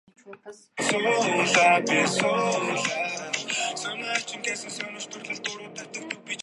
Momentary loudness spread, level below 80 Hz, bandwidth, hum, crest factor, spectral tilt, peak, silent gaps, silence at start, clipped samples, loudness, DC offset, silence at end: 17 LU; -76 dBFS; 11.5 kHz; none; 20 dB; -2.5 dB/octave; -6 dBFS; none; 0.25 s; under 0.1%; -25 LUFS; under 0.1%; 0 s